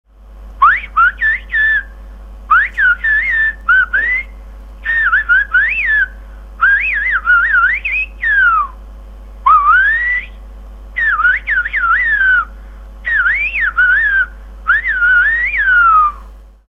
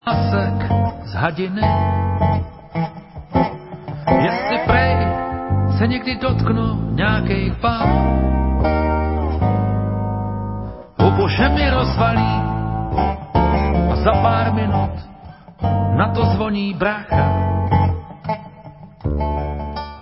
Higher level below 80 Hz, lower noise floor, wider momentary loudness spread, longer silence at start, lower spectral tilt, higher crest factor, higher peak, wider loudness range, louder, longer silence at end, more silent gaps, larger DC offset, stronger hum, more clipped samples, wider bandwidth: second, -32 dBFS vs -26 dBFS; second, -35 dBFS vs -39 dBFS; second, 7 LU vs 10 LU; first, 0.3 s vs 0.05 s; second, -3.5 dB/octave vs -12 dB/octave; about the same, 14 dB vs 18 dB; about the same, 0 dBFS vs 0 dBFS; about the same, 2 LU vs 3 LU; first, -11 LUFS vs -19 LUFS; first, 0.3 s vs 0 s; neither; first, 0.2% vs under 0.1%; first, 50 Hz at -30 dBFS vs none; neither; first, 7.4 kHz vs 5.8 kHz